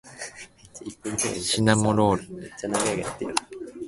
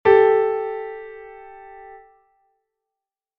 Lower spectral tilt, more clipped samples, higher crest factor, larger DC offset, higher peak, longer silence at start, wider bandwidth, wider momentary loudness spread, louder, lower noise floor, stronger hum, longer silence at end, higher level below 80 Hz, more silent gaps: about the same, -4 dB/octave vs -3.5 dB/octave; neither; about the same, 24 dB vs 20 dB; neither; about the same, -2 dBFS vs -2 dBFS; about the same, 0.05 s vs 0.05 s; first, 11.5 kHz vs 4.7 kHz; second, 20 LU vs 27 LU; second, -24 LUFS vs -18 LUFS; second, -45 dBFS vs -87 dBFS; neither; second, 0 s vs 1.4 s; first, -52 dBFS vs -60 dBFS; neither